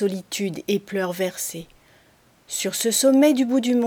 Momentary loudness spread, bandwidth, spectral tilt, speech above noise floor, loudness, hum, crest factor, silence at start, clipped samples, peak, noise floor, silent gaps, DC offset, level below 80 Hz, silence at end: 13 LU; over 20 kHz; -3.5 dB/octave; 36 dB; -22 LUFS; none; 16 dB; 0 s; under 0.1%; -6 dBFS; -57 dBFS; none; under 0.1%; -66 dBFS; 0 s